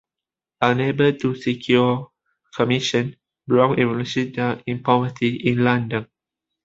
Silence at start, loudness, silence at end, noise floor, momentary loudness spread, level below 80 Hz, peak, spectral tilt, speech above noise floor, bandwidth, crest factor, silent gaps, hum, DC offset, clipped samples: 0.6 s; -21 LUFS; 0.6 s; -88 dBFS; 7 LU; -58 dBFS; -2 dBFS; -6.5 dB/octave; 68 dB; 7.8 kHz; 20 dB; none; none; under 0.1%; under 0.1%